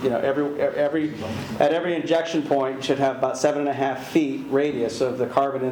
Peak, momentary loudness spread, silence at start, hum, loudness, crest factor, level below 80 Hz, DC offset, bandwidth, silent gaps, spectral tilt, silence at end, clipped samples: -4 dBFS; 3 LU; 0 s; none; -23 LUFS; 18 dB; -62 dBFS; under 0.1%; 20 kHz; none; -5.5 dB/octave; 0 s; under 0.1%